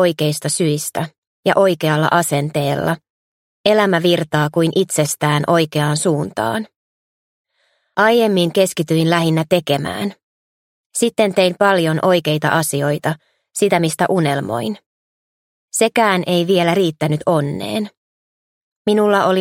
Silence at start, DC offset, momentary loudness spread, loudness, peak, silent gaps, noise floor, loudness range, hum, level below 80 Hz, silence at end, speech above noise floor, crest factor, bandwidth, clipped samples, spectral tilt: 0 s; under 0.1%; 10 LU; -17 LUFS; 0 dBFS; 1.18-1.43 s, 3.10-3.64 s, 6.76-7.44 s, 10.23-10.90 s, 14.86-15.68 s, 17.97-18.85 s; -64 dBFS; 2 LU; none; -58 dBFS; 0 s; 49 dB; 16 dB; 16.5 kHz; under 0.1%; -5 dB/octave